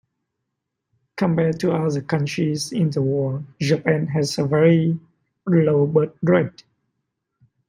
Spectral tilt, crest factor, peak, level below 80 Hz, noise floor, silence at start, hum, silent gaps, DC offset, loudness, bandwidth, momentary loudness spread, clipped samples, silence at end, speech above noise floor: -7 dB/octave; 18 dB; -4 dBFS; -60 dBFS; -80 dBFS; 1.15 s; none; none; under 0.1%; -20 LUFS; 12 kHz; 8 LU; under 0.1%; 1.2 s; 60 dB